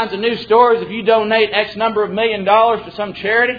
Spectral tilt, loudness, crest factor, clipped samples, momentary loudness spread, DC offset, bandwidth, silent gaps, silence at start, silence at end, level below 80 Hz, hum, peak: -6.5 dB/octave; -15 LUFS; 14 dB; under 0.1%; 7 LU; under 0.1%; 5 kHz; none; 0 s; 0 s; -52 dBFS; none; 0 dBFS